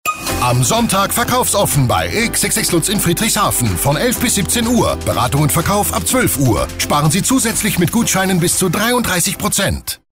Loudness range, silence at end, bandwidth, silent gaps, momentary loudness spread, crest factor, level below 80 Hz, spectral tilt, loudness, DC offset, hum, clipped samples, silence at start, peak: 1 LU; 0.15 s; 16.5 kHz; none; 3 LU; 10 dB; -34 dBFS; -3.5 dB/octave; -14 LUFS; under 0.1%; none; under 0.1%; 0.05 s; -4 dBFS